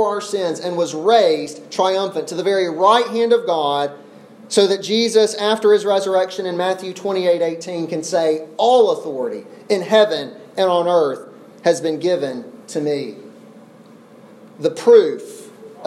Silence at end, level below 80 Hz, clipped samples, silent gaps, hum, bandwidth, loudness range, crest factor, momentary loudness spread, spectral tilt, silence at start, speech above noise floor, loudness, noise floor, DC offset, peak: 0 s; -76 dBFS; under 0.1%; none; none; 13.5 kHz; 4 LU; 16 dB; 11 LU; -4 dB/octave; 0 s; 27 dB; -18 LUFS; -44 dBFS; under 0.1%; -2 dBFS